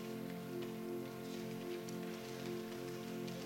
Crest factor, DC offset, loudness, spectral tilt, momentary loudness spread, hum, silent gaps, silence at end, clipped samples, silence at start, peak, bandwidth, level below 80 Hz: 12 dB; under 0.1%; -45 LUFS; -5.5 dB/octave; 1 LU; none; none; 0 s; under 0.1%; 0 s; -32 dBFS; 16.5 kHz; -76 dBFS